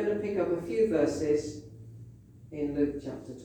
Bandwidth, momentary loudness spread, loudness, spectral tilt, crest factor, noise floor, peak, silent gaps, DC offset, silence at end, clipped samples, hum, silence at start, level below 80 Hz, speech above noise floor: 9.6 kHz; 21 LU; -30 LUFS; -6.5 dB/octave; 16 dB; -50 dBFS; -14 dBFS; none; under 0.1%; 0 s; under 0.1%; none; 0 s; -56 dBFS; 21 dB